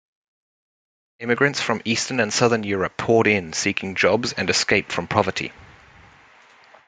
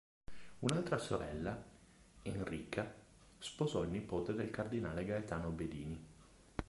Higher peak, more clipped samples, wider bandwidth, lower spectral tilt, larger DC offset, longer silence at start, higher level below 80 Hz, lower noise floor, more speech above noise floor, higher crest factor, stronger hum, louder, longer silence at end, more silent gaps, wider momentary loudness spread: first, 0 dBFS vs -14 dBFS; neither; second, 9.6 kHz vs 11.5 kHz; second, -3.5 dB/octave vs -6 dB/octave; neither; first, 1.2 s vs 0.3 s; about the same, -58 dBFS vs -58 dBFS; second, -51 dBFS vs -63 dBFS; first, 30 dB vs 23 dB; second, 22 dB vs 28 dB; neither; first, -21 LUFS vs -42 LUFS; first, 1.25 s vs 0.05 s; neither; second, 7 LU vs 13 LU